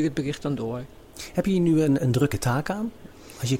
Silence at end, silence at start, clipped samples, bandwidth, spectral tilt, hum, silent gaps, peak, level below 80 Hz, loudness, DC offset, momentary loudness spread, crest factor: 0 s; 0 s; under 0.1%; 16 kHz; -6.5 dB/octave; none; none; -10 dBFS; -48 dBFS; -25 LUFS; under 0.1%; 15 LU; 16 dB